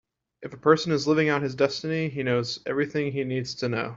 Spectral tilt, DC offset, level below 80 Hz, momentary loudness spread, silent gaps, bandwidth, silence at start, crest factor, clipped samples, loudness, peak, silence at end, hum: -6 dB/octave; under 0.1%; -64 dBFS; 7 LU; none; 7.8 kHz; 0.4 s; 20 dB; under 0.1%; -25 LUFS; -6 dBFS; 0 s; none